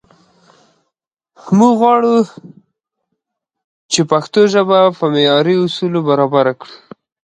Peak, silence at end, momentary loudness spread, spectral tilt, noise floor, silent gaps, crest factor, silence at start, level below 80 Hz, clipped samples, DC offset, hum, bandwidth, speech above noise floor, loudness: 0 dBFS; 0.65 s; 6 LU; -5 dB/octave; -77 dBFS; 3.64-3.89 s; 14 dB; 1.45 s; -64 dBFS; under 0.1%; under 0.1%; none; 10.5 kHz; 65 dB; -13 LUFS